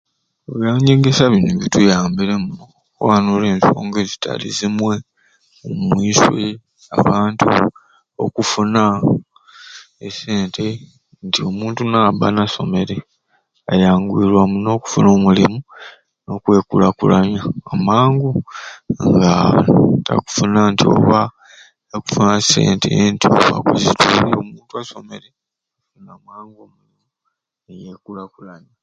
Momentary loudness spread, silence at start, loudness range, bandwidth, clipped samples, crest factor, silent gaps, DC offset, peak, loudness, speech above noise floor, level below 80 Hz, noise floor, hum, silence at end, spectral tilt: 17 LU; 0.5 s; 5 LU; 8.8 kHz; under 0.1%; 16 dB; none; under 0.1%; 0 dBFS; -15 LUFS; 63 dB; -46 dBFS; -78 dBFS; none; 0.25 s; -5.5 dB/octave